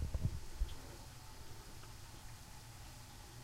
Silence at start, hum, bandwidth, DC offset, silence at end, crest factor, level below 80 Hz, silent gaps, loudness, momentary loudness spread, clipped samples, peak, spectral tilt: 0 s; none; 16 kHz; under 0.1%; 0 s; 20 dB; -48 dBFS; none; -50 LUFS; 11 LU; under 0.1%; -26 dBFS; -5 dB/octave